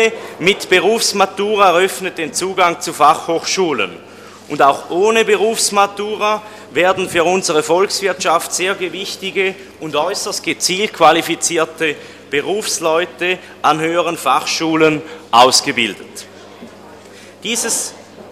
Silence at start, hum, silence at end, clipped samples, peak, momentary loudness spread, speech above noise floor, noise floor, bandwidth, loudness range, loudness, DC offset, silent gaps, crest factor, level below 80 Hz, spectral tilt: 0 s; none; 0 s; under 0.1%; 0 dBFS; 9 LU; 23 dB; -38 dBFS; 16 kHz; 3 LU; -15 LUFS; under 0.1%; none; 16 dB; -58 dBFS; -2.5 dB/octave